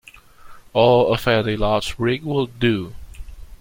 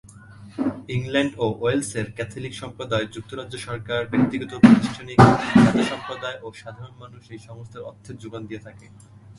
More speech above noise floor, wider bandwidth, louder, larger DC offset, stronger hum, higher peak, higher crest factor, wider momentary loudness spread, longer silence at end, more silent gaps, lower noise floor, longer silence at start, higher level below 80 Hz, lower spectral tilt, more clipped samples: about the same, 24 dB vs 22 dB; first, 16.5 kHz vs 11.5 kHz; about the same, -19 LUFS vs -21 LUFS; neither; neither; about the same, -2 dBFS vs 0 dBFS; about the same, 18 dB vs 22 dB; second, 9 LU vs 24 LU; about the same, 0.05 s vs 0.05 s; neither; about the same, -42 dBFS vs -44 dBFS; first, 0.45 s vs 0.15 s; first, -38 dBFS vs -48 dBFS; about the same, -6 dB/octave vs -6.5 dB/octave; neither